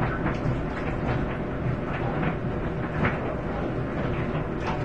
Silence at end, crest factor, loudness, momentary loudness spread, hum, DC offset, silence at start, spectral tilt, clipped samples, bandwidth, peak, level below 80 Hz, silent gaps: 0 s; 16 dB; -28 LUFS; 3 LU; none; 0.6%; 0 s; -8.5 dB/octave; under 0.1%; 8.2 kHz; -12 dBFS; -38 dBFS; none